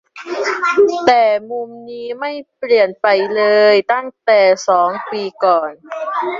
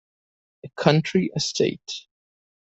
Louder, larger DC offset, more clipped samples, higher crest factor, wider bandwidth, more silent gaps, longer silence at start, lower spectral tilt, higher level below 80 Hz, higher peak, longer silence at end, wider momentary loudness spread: first, -14 LUFS vs -22 LUFS; neither; neither; second, 14 dB vs 22 dB; about the same, 7.6 kHz vs 8.2 kHz; neither; second, 0.15 s vs 0.65 s; second, -3.5 dB/octave vs -5 dB/octave; about the same, -64 dBFS vs -62 dBFS; about the same, -2 dBFS vs -2 dBFS; second, 0 s vs 0.65 s; about the same, 14 LU vs 15 LU